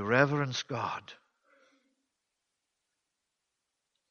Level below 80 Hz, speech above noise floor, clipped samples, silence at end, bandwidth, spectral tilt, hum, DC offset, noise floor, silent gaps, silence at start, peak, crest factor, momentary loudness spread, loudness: -74 dBFS; 55 dB; under 0.1%; 2.95 s; 7.2 kHz; -5.5 dB/octave; none; under 0.1%; -85 dBFS; none; 0 s; -8 dBFS; 28 dB; 16 LU; -31 LUFS